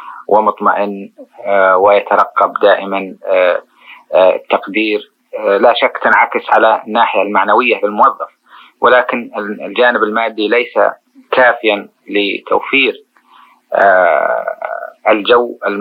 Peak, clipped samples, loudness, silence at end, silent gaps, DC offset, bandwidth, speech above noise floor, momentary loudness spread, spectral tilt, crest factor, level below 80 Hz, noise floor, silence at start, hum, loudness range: 0 dBFS; under 0.1%; -12 LUFS; 0 s; none; under 0.1%; 15 kHz; 34 dB; 10 LU; -6 dB/octave; 12 dB; -62 dBFS; -46 dBFS; 0 s; none; 2 LU